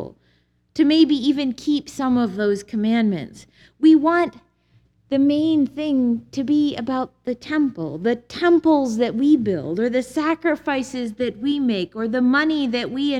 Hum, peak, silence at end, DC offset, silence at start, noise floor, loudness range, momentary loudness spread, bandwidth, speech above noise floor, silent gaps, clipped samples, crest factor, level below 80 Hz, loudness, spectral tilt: 60 Hz at -55 dBFS; -4 dBFS; 0 s; under 0.1%; 0 s; -62 dBFS; 2 LU; 9 LU; 11 kHz; 43 dB; none; under 0.1%; 16 dB; -58 dBFS; -20 LUFS; -5.5 dB/octave